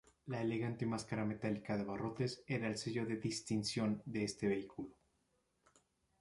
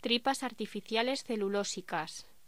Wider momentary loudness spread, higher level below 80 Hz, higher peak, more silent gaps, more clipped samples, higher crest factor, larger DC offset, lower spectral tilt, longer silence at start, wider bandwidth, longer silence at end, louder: second, 4 LU vs 8 LU; about the same, -70 dBFS vs -72 dBFS; second, -26 dBFS vs -14 dBFS; neither; neither; about the same, 16 dB vs 20 dB; second, under 0.1% vs 0.2%; first, -5.5 dB/octave vs -3 dB/octave; first, 0.25 s vs 0.05 s; second, 11.5 kHz vs 16 kHz; first, 1.3 s vs 0.25 s; second, -40 LUFS vs -34 LUFS